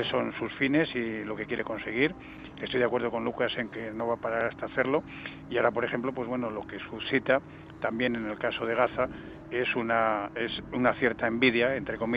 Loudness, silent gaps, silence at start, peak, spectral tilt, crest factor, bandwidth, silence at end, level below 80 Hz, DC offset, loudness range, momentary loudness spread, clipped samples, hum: -29 LUFS; none; 0 s; -10 dBFS; -7.5 dB/octave; 20 dB; 6 kHz; 0 s; -58 dBFS; under 0.1%; 3 LU; 9 LU; under 0.1%; none